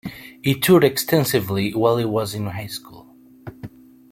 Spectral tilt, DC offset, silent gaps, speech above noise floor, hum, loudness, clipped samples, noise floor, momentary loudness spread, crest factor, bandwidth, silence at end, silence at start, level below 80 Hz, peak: -5.5 dB/octave; under 0.1%; none; 28 dB; none; -19 LUFS; under 0.1%; -47 dBFS; 24 LU; 18 dB; 16.5 kHz; 0.45 s; 0.05 s; -54 dBFS; -2 dBFS